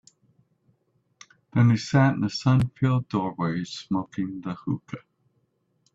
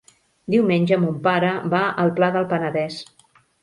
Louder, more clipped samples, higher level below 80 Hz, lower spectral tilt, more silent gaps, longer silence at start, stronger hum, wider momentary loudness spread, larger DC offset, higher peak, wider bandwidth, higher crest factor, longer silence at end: second, -25 LUFS vs -20 LUFS; neither; first, -56 dBFS vs -64 dBFS; about the same, -7 dB/octave vs -7.5 dB/octave; neither; first, 1.55 s vs 0.5 s; neither; first, 11 LU vs 8 LU; neither; about the same, -8 dBFS vs -6 dBFS; second, 7.8 kHz vs 11.5 kHz; about the same, 18 dB vs 16 dB; first, 0.95 s vs 0.6 s